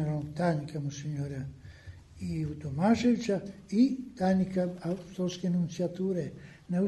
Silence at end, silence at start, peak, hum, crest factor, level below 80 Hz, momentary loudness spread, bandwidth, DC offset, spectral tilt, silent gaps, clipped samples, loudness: 0 s; 0 s; -14 dBFS; none; 16 dB; -58 dBFS; 15 LU; 11.5 kHz; under 0.1%; -7.5 dB/octave; none; under 0.1%; -31 LUFS